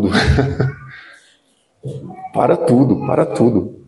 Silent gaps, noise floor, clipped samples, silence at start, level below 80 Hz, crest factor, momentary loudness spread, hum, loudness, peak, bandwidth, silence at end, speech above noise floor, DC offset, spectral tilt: none; -59 dBFS; under 0.1%; 0 s; -32 dBFS; 16 dB; 19 LU; none; -15 LUFS; 0 dBFS; 11.5 kHz; 0.15 s; 44 dB; under 0.1%; -7 dB/octave